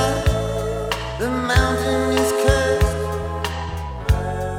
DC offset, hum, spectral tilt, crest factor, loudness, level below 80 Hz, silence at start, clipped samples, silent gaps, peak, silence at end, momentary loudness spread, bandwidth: under 0.1%; none; -5 dB/octave; 18 dB; -21 LUFS; -26 dBFS; 0 s; under 0.1%; none; -2 dBFS; 0 s; 8 LU; 17 kHz